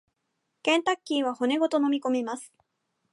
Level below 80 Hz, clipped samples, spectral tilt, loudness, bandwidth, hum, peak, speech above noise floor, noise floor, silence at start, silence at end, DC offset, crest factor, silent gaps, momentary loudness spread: -84 dBFS; under 0.1%; -2.5 dB/octave; -26 LUFS; 11.5 kHz; none; -10 dBFS; 53 dB; -79 dBFS; 0.65 s; 0.65 s; under 0.1%; 18 dB; none; 7 LU